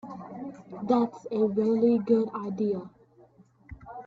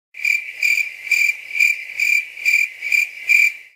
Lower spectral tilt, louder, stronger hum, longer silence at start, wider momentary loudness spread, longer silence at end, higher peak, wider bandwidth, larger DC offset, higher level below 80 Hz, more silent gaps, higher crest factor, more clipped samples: first, -9 dB/octave vs 4.5 dB/octave; second, -27 LUFS vs -16 LUFS; neither; about the same, 0.05 s vs 0.15 s; first, 17 LU vs 5 LU; about the same, 0.05 s vs 0.15 s; second, -12 dBFS vs -2 dBFS; second, 7.4 kHz vs 16 kHz; neither; first, -62 dBFS vs -78 dBFS; neither; about the same, 16 dB vs 16 dB; neither